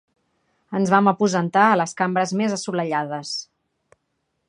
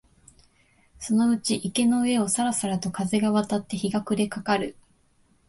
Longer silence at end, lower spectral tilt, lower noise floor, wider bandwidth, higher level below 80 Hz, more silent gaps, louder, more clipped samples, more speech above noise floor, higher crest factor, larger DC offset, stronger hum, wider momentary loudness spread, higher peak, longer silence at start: first, 1.05 s vs 0.75 s; about the same, -5 dB/octave vs -4.5 dB/octave; first, -74 dBFS vs -63 dBFS; about the same, 10.5 kHz vs 11.5 kHz; second, -70 dBFS vs -60 dBFS; neither; first, -21 LUFS vs -25 LUFS; neither; first, 54 dB vs 39 dB; about the same, 20 dB vs 16 dB; neither; neither; first, 11 LU vs 6 LU; first, -2 dBFS vs -10 dBFS; second, 0.7 s vs 1 s